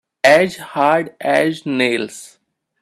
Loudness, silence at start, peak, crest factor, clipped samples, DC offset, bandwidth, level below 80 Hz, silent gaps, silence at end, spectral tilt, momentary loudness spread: -16 LUFS; 0.25 s; 0 dBFS; 18 dB; under 0.1%; under 0.1%; 14 kHz; -64 dBFS; none; 0.55 s; -4.5 dB/octave; 10 LU